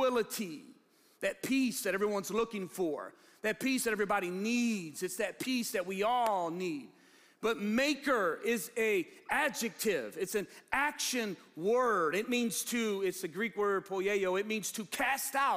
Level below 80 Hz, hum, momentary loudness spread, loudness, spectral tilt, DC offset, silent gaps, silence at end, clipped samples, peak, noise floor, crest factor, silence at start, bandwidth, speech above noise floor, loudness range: -70 dBFS; none; 7 LU; -33 LUFS; -3.5 dB/octave; under 0.1%; none; 0 s; under 0.1%; -14 dBFS; -65 dBFS; 18 dB; 0 s; 15.5 kHz; 32 dB; 2 LU